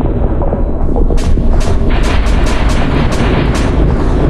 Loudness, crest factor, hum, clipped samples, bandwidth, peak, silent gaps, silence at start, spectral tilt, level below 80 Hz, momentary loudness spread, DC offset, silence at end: -14 LUFS; 10 dB; none; under 0.1%; 11 kHz; 0 dBFS; none; 0 s; -6.5 dB/octave; -12 dBFS; 3 LU; under 0.1%; 0 s